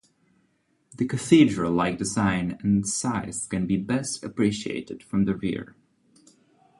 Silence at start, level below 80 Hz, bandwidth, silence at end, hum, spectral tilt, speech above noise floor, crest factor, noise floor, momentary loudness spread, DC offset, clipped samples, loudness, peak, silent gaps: 0.95 s; -52 dBFS; 11.5 kHz; 1.15 s; none; -5 dB/octave; 44 dB; 20 dB; -69 dBFS; 12 LU; under 0.1%; under 0.1%; -25 LUFS; -4 dBFS; none